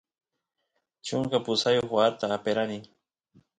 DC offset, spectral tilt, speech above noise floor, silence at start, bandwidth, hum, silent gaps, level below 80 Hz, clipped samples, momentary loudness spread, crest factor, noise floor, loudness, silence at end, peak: under 0.1%; -4.5 dB/octave; 37 dB; 1.05 s; 9.4 kHz; none; none; -66 dBFS; under 0.1%; 9 LU; 20 dB; -64 dBFS; -27 LUFS; 0.75 s; -10 dBFS